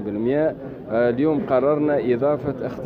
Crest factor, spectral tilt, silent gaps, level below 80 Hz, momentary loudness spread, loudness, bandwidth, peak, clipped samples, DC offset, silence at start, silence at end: 14 dB; -10 dB/octave; none; -52 dBFS; 6 LU; -21 LUFS; 5.2 kHz; -6 dBFS; under 0.1%; under 0.1%; 0 s; 0 s